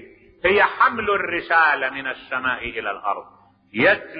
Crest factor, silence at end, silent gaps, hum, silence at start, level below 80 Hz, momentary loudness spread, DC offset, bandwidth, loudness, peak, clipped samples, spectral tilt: 18 dB; 0 s; none; none; 0 s; -54 dBFS; 11 LU; under 0.1%; 5.2 kHz; -20 LUFS; -4 dBFS; under 0.1%; -8.5 dB/octave